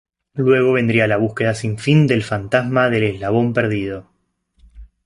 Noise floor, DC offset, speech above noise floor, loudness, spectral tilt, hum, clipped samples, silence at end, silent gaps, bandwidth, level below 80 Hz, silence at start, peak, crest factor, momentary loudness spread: -64 dBFS; under 0.1%; 47 dB; -17 LUFS; -7 dB/octave; none; under 0.1%; 0.2 s; none; 11.5 kHz; -48 dBFS; 0.35 s; -2 dBFS; 16 dB; 7 LU